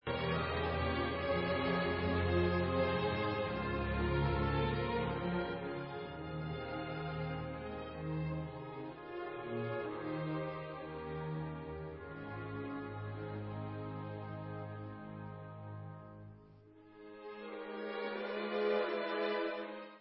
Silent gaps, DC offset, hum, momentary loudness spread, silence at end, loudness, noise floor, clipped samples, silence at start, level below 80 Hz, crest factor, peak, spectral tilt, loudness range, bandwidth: none; under 0.1%; none; 13 LU; 0 s; -39 LUFS; -60 dBFS; under 0.1%; 0.05 s; -50 dBFS; 18 dB; -20 dBFS; -5 dB/octave; 12 LU; 5.6 kHz